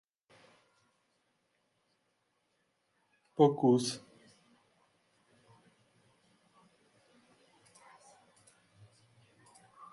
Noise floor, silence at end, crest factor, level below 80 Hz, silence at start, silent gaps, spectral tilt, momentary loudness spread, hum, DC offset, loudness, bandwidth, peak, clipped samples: -79 dBFS; 0.1 s; 28 dB; -84 dBFS; 3.4 s; none; -6 dB/octave; 20 LU; none; under 0.1%; -30 LUFS; 11.5 kHz; -12 dBFS; under 0.1%